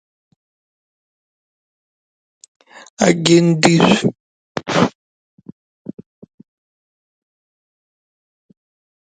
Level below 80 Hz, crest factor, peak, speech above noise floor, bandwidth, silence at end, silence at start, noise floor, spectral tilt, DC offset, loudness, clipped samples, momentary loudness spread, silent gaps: -58 dBFS; 20 dB; 0 dBFS; over 78 dB; 9.4 kHz; 4.15 s; 3 s; under -90 dBFS; -5 dB/octave; under 0.1%; -15 LUFS; under 0.1%; 24 LU; 4.20-4.55 s